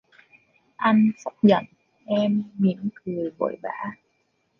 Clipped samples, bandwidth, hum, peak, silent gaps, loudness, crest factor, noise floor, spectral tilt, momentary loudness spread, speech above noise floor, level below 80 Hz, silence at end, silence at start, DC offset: under 0.1%; 6.8 kHz; none; -6 dBFS; none; -24 LUFS; 20 dB; -70 dBFS; -8 dB/octave; 12 LU; 48 dB; -68 dBFS; 0.65 s; 0.8 s; under 0.1%